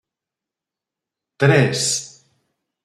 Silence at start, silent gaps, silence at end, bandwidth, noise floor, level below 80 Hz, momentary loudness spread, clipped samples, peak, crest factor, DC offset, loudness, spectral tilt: 1.4 s; none; 0.8 s; 13.5 kHz; -87 dBFS; -62 dBFS; 11 LU; under 0.1%; -2 dBFS; 20 dB; under 0.1%; -17 LUFS; -4 dB/octave